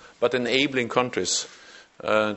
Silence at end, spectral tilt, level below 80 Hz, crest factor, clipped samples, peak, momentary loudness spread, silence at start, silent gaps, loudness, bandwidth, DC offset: 0 s; -2.5 dB/octave; -62 dBFS; 22 dB; under 0.1%; -4 dBFS; 7 LU; 0.05 s; none; -24 LUFS; 8.4 kHz; under 0.1%